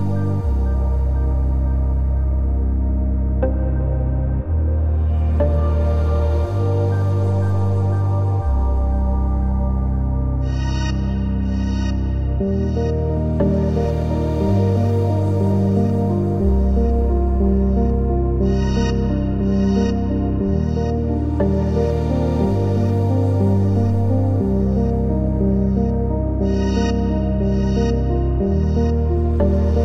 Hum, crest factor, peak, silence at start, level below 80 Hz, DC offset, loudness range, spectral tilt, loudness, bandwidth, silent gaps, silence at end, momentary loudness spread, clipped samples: none; 12 dB; -6 dBFS; 0 s; -22 dBFS; under 0.1%; 2 LU; -9.5 dB/octave; -19 LUFS; 6.4 kHz; none; 0 s; 3 LU; under 0.1%